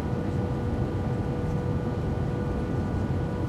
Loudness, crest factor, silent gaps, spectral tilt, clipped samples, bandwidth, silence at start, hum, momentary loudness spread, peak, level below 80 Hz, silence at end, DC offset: -29 LUFS; 12 dB; none; -9 dB/octave; under 0.1%; 12 kHz; 0 s; none; 1 LU; -16 dBFS; -38 dBFS; 0 s; under 0.1%